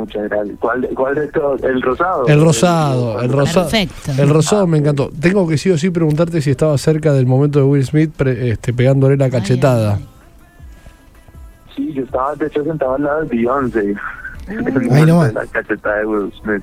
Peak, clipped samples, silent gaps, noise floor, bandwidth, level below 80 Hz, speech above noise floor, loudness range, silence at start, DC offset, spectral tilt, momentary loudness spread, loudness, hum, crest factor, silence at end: 0 dBFS; under 0.1%; none; -42 dBFS; 15 kHz; -40 dBFS; 28 dB; 6 LU; 0 s; under 0.1%; -6.5 dB/octave; 9 LU; -15 LUFS; none; 14 dB; 0 s